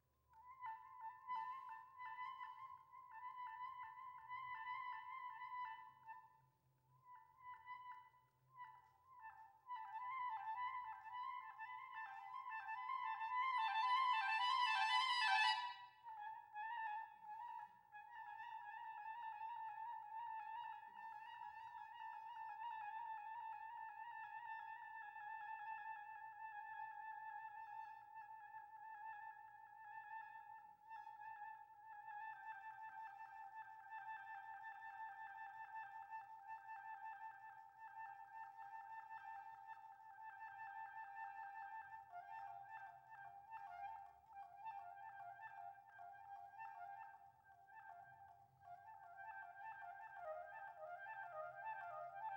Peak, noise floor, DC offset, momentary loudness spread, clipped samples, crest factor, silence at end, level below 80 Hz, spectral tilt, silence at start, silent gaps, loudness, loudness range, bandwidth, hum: -26 dBFS; -79 dBFS; under 0.1%; 15 LU; under 0.1%; 24 dB; 0 s; under -90 dBFS; 0 dB/octave; 0.3 s; none; -50 LUFS; 16 LU; 16 kHz; none